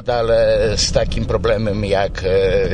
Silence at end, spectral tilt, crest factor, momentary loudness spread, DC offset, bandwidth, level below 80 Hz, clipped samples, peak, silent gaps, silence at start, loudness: 0 s; -4.5 dB/octave; 14 dB; 4 LU; under 0.1%; 10 kHz; -26 dBFS; under 0.1%; -2 dBFS; none; 0 s; -17 LUFS